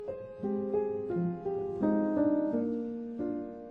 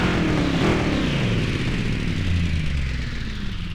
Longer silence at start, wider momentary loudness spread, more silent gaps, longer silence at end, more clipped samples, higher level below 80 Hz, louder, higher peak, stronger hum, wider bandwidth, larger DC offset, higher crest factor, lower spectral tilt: about the same, 0 s vs 0 s; about the same, 9 LU vs 9 LU; neither; about the same, 0 s vs 0 s; neither; second, -64 dBFS vs -28 dBFS; second, -32 LUFS vs -23 LUFS; second, -16 dBFS vs -6 dBFS; neither; second, 4 kHz vs 12 kHz; neither; about the same, 16 dB vs 16 dB; first, -11 dB/octave vs -6 dB/octave